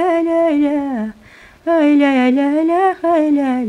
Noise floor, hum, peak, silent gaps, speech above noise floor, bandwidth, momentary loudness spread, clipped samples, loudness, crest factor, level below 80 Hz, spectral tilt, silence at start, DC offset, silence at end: -43 dBFS; none; -2 dBFS; none; 30 dB; 10 kHz; 10 LU; under 0.1%; -15 LUFS; 12 dB; -54 dBFS; -6 dB/octave; 0 s; under 0.1%; 0 s